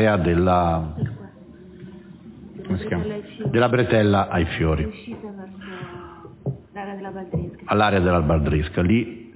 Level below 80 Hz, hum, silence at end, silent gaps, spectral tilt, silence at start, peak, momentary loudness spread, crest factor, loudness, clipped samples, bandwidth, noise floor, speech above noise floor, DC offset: -34 dBFS; none; 0.05 s; none; -11.5 dB/octave; 0 s; -6 dBFS; 23 LU; 18 dB; -22 LUFS; under 0.1%; 4 kHz; -44 dBFS; 23 dB; under 0.1%